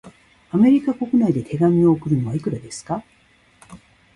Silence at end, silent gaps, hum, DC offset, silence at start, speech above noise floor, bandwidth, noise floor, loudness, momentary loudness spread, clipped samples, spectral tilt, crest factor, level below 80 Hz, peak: 0.4 s; none; none; under 0.1%; 0.05 s; 35 dB; 11.5 kHz; -53 dBFS; -19 LUFS; 13 LU; under 0.1%; -8 dB/octave; 16 dB; -54 dBFS; -6 dBFS